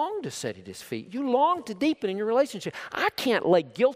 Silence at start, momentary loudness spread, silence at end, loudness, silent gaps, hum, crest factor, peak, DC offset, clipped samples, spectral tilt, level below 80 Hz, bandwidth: 0 s; 13 LU; 0 s; -27 LUFS; none; none; 18 dB; -8 dBFS; under 0.1%; under 0.1%; -4.5 dB/octave; -70 dBFS; 16 kHz